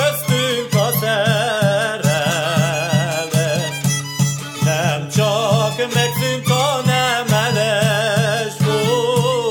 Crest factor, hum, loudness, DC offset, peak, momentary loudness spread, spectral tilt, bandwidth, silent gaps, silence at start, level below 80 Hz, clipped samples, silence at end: 14 dB; none; -17 LUFS; under 0.1%; -4 dBFS; 3 LU; -4.5 dB/octave; 19 kHz; none; 0 s; -56 dBFS; under 0.1%; 0 s